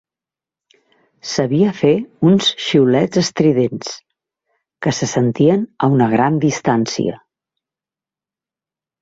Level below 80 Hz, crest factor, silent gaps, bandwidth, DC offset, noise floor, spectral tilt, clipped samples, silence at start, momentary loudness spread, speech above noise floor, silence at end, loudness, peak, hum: -56 dBFS; 16 dB; none; 8 kHz; under 0.1%; -89 dBFS; -5.5 dB/octave; under 0.1%; 1.25 s; 10 LU; 74 dB; 1.85 s; -16 LUFS; -2 dBFS; none